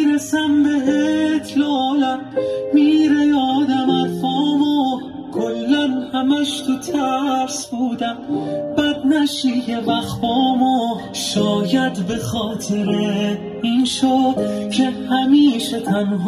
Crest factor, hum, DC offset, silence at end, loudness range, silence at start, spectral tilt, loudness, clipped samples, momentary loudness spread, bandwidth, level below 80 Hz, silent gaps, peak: 14 dB; none; under 0.1%; 0 s; 3 LU; 0 s; -5 dB/octave; -18 LUFS; under 0.1%; 8 LU; 13.5 kHz; -52 dBFS; none; -4 dBFS